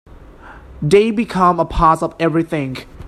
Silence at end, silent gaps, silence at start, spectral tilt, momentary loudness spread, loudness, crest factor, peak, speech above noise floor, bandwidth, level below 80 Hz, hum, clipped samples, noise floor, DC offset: 0 s; none; 0.45 s; -7 dB/octave; 9 LU; -16 LUFS; 16 dB; 0 dBFS; 23 dB; 13 kHz; -32 dBFS; none; under 0.1%; -38 dBFS; under 0.1%